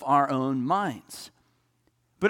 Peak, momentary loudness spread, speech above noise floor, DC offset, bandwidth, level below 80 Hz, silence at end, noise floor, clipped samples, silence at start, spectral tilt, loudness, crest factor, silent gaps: -10 dBFS; 19 LU; 44 dB; under 0.1%; 17 kHz; -70 dBFS; 0 s; -70 dBFS; under 0.1%; 0 s; -6 dB/octave; -26 LUFS; 18 dB; none